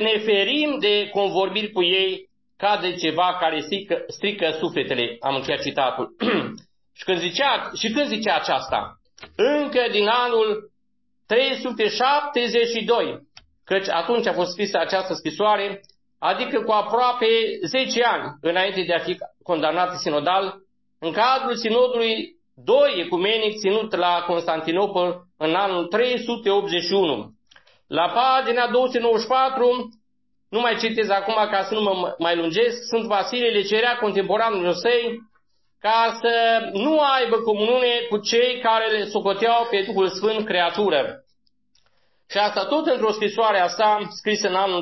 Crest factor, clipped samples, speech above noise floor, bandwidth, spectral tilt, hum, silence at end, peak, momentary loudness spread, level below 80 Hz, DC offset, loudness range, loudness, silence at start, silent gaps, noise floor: 16 dB; under 0.1%; 54 dB; 6.2 kHz; -4 dB/octave; none; 0 s; -6 dBFS; 7 LU; -66 dBFS; under 0.1%; 3 LU; -21 LUFS; 0 s; none; -75 dBFS